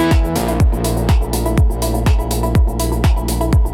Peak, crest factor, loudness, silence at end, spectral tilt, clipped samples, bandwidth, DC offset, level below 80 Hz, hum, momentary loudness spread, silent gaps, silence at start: -4 dBFS; 10 dB; -16 LUFS; 0 s; -6 dB/octave; under 0.1%; 17 kHz; under 0.1%; -16 dBFS; none; 2 LU; none; 0 s